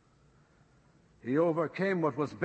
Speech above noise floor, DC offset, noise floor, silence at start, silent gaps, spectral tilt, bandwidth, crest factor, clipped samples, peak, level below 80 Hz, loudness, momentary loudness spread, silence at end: 34 dB; under 0.1%; -64 dBFS; 1.25 s; none; -8 dB/octave; 8.6 kHz; 16 dB; under 0.1%; -16 dBFS; -72 dBFS; -31 LUFS; 4 LU; 0 s